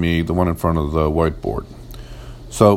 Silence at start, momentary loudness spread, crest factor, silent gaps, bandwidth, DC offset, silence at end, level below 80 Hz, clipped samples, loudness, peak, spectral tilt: 0 s; 19 LU; 18 dB; none; 16.5 kHz; under 0.1%; 0 s; -32 dBFS; under 0.1%; -19 LUFS; 0 dBFS; -7 dB/octave